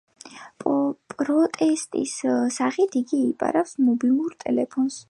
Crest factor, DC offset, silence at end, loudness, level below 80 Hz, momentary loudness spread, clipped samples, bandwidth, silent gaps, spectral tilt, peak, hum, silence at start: 16 dB; under 0.1%; 0.1 s; -23 LUFS; -72 dBFS; 7 LU; under 0.1%; 11.5 kHz; none; -4.5 dB/octave; -6 dBFS; none; 0.25 s